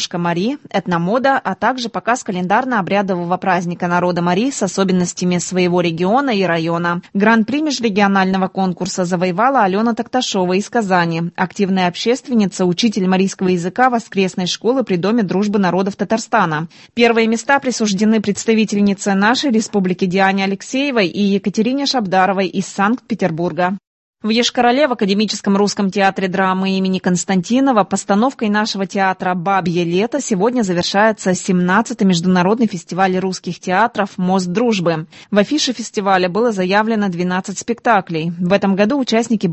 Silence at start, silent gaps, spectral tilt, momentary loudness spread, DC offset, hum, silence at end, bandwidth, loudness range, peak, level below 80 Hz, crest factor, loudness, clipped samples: 0 s; 23.87-24.13 s; -5 dB/octave; 5 LU; under 0.1%; none; 0 s; 8.6 kHz; 2 LU; 0 dBFS; -56 dBFS; 16 dB; -16 LUFS; under 0.1%